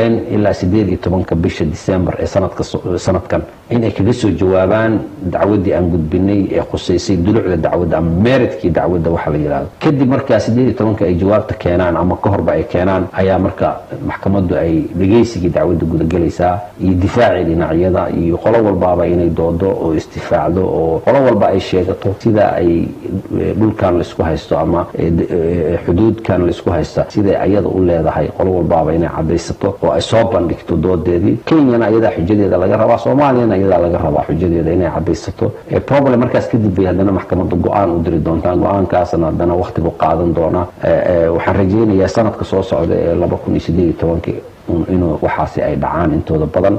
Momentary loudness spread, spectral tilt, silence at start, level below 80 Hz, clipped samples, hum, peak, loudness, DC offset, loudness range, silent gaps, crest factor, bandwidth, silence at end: 5 LU; -8 dB/octave; 0 s; -32 dBFS; under 0.1%; none; 0 dBFS; -14 LUFS; under 0.1%; 2 LU; none; 12 dB; 8.6 kHz; 0 s